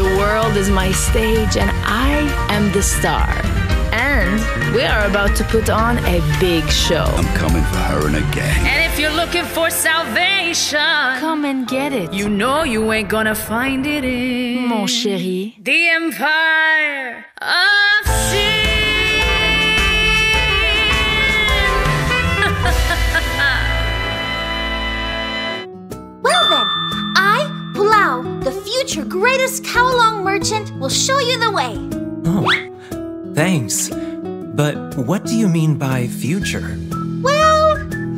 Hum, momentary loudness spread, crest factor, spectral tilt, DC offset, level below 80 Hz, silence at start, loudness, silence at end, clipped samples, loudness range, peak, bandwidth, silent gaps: none; 8 LU; 16 dB; -4 dB/octave; under 0.1%; -26 dBFS; 0 s; -16 LUFS; 0 s; under 0.1%; 5 LU; 0 dBFS; 16 kHz; none